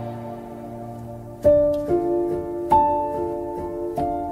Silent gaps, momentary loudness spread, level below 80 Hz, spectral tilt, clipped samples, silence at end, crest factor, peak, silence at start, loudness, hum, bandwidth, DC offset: none; 17 LU; -44 dBFS; -9 dB/octave; under 0.1%; 0 s; 18 dB; -6 dBFS; 0 s; -22 LUFS; none; 15.5 kHz; under 0.1%